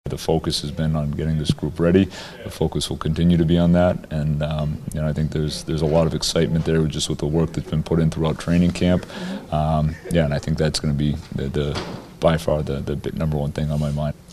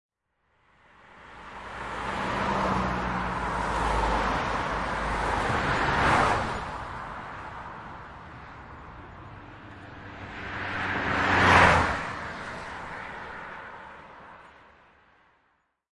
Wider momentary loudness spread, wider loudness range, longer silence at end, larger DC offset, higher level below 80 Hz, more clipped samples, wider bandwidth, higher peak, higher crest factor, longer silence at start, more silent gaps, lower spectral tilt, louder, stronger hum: second, 8 LU vs 23 LU; second, 3 LU vs 17 LU; second, 0 s vs 1.45 s; neither; first, -34 dBFS vs -42 dBFS; neither; first, 13 kHz vs 11.5 kHz; about the same, -4 dBFS vs -4 dBFS; second, 18 dB vs 24 dB; second, 0.05 s vs 1.05 s; neither; first, -6.5 dB/octave vs -5 dB/octave; first, -21 LUFS vs -26 LUFS; neither